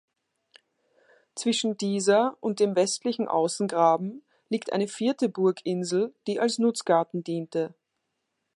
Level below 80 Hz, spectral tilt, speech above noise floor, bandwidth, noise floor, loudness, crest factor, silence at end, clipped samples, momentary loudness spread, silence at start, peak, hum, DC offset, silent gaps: -80 dBFS; -4.5 dB/octave; 55 dB; 11.5 kHz; -80 dBFS; -26 LUFS; 18 dB; 0.85 s; under 0.1%; 9 LU; 1.35 s; -8 dBFS; none; under 0.1%; none